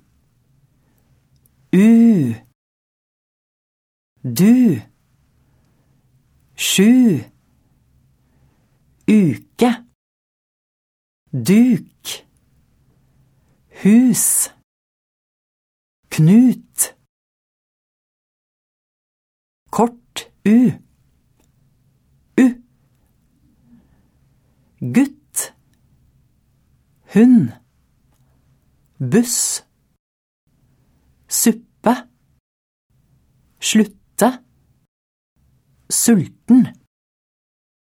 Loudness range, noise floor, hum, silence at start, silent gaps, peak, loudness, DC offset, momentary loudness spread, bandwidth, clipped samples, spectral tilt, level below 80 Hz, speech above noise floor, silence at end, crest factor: 7 LU; -59 dBFS; none; 1.75 s; 2.55-4.16 s, 9.95-11.26 s, 14.64-16.03 s, 17.09-19.66 s, 29.99-30.47 s, 32.40-32.90 s, 34.88-35.36 s; -2 dBFS; -15 LUFS; under 0.1%; 16 LU; 16.5 kHz; under 0.1%; -5 dB/octave; -62 dBFS; 46 dB; 1.25 s; 18 dB